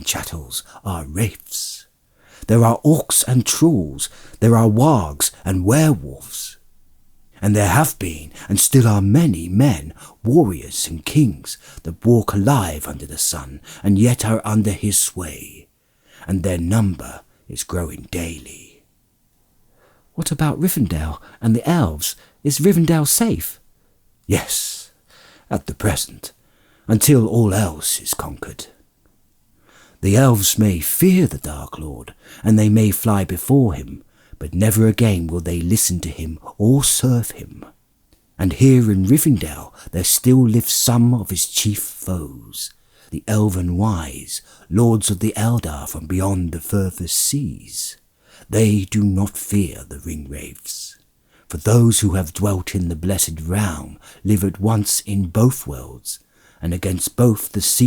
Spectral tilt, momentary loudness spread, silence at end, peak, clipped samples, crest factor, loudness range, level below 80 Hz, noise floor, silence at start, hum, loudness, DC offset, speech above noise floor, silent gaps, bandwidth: -5 dB/octave; 17 LU; 0 s; -2 dBFS; under 0.1%; 16 dB; 6 LU; -42 dBFS; -61 dBFS; 0 s; none; -18 LUFS; under 0.1%; 43 dB; none; over 20 kHz